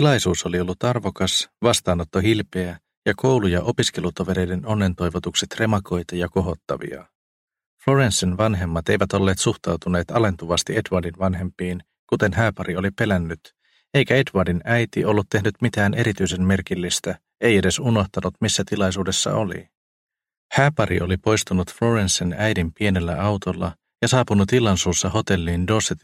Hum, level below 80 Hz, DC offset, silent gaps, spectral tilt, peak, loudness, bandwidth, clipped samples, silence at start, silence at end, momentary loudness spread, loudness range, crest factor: none; -44 dBFS; under 0.1%; 2.97-3.02 s, 7.15-7.48 s, 7.66-7.77 s, 11.99-12.08 s, 19.77-20.07 s, 20.37-20.49 s; -4.5 dB/octave; -2 dBFS; -21 LUFS; 15.5 kHz; under 0.1%; 0 s; 0.05 s; 8 LU; 2 LU; 20 dB